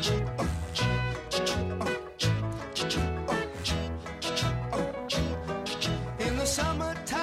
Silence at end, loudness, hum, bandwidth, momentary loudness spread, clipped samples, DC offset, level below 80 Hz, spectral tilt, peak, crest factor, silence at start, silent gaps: 0 s; -30 LUFS; none; 16 kHz; 4 LU; under 0.1%; under 0.1%; -40 dBFS; -4.5 dB/octave; -14 dBFS; 16 dB; 0 s; none